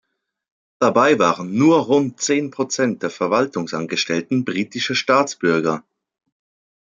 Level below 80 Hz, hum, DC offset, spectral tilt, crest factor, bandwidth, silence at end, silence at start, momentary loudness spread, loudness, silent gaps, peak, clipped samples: -68 dBFS; none; under 0.1%; -4.5 dB/octave; 18 dB; 9.4 kHz; 1.15 s; 0.8 s; 8 LU; -19 LUFS; none; -2 dBFS; under 0.1%